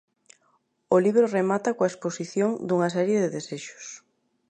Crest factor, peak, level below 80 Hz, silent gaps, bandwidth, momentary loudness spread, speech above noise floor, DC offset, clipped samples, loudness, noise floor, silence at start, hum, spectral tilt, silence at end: 18 dB; -8 dBFS; -76 dBFS; none; 9.4 kHz; 16 LU; 44 dB; under 0.1%; under 0.1%; -24 LUFS; -68 dBFS; 0.9 s; none; -6 dB/octave; 0.5 s